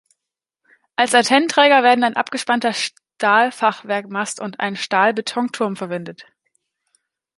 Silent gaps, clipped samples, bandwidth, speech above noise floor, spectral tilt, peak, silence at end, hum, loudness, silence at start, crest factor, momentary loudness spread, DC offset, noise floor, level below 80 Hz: none; under 0.1%; 11.5 kHz; 66 dB; -3 dB/octave; -2 dBFS; 1.15 s; none; -18 LUFS; 1 s; 18 dB; 13 LU; under 0.1%; -84 dBFS; -72 dBFS